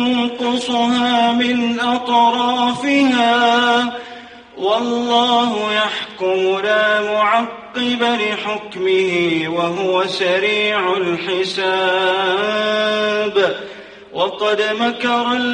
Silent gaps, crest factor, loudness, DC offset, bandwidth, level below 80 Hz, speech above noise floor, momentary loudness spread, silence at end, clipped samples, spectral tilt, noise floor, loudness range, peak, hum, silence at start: none; 16 dB; -16 LUFS; under 0.1%; 10 kHz; -60 dBFS; 20 dB; 7 LU; 0 s; under 0.1%; -4 dB/octave; -37 dBFS; 2 LU; 0 dBFS; none; 0 s